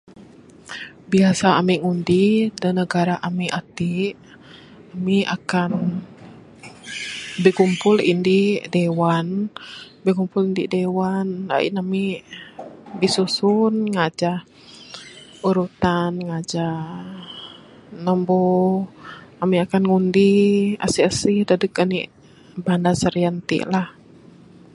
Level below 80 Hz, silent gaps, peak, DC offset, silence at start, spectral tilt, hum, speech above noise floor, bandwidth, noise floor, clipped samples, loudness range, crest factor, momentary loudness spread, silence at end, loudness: -54 dBFS; none; -2 dBFS; under 0.1%; 0.2 s; -6 dB/octave; none; 27 dB; 11.5 kHz; -46 dBFS; under 0.1%; 6 LU; 20 dB; 18 LU; 0.85 s; -20 LUFS